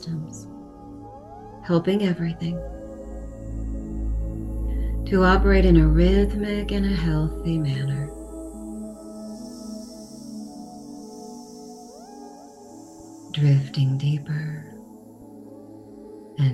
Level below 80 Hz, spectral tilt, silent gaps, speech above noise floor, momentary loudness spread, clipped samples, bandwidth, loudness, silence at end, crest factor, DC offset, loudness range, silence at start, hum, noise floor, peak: -30 dBFS; -7.5 dB/octave; none; 24 dB; 25 LU; under 0.1%; 11.5 kHz; -23 LUFS; 0 s; 20 dB; under 0.1%; 18 LU; 0 s; none; -44 dBFS; -6 dBFS